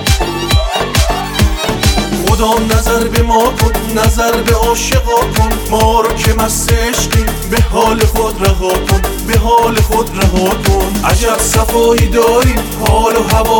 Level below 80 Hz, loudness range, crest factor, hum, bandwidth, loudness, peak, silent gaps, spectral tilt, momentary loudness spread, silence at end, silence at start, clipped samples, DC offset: -16 dBFS; 1 LU; 10 dB; none; 19.5 kHz; -12 LUFS; 0 dBFS; none; -4.5 dB/octave; 4 LU; 0 s; 0 s; under 0.1%; under 0.1%